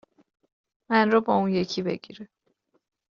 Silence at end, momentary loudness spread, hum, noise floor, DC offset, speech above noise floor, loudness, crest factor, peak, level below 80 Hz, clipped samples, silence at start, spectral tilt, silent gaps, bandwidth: 0.9 s; 19 LU; none; -71 dBFS; under 0.1%; 47 dB; -24 LUFS; 22 dB; -6 dBFS; -66 dBFS; under 0.1%; 0.9 s; -4.5 dB/octave; none; 7.2 kHz